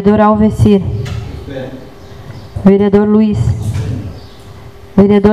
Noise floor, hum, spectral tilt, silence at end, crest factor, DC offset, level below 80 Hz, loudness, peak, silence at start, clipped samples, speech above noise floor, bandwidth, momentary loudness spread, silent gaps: -33 dBFS; none; -8.5 dB/octave; 0 s; 12 dB; 1%; -30 dBFS; -11 LUFS; 0 dBFS; 0 s; 0.4%; 25 dB; 11 kHz; 21 LU; none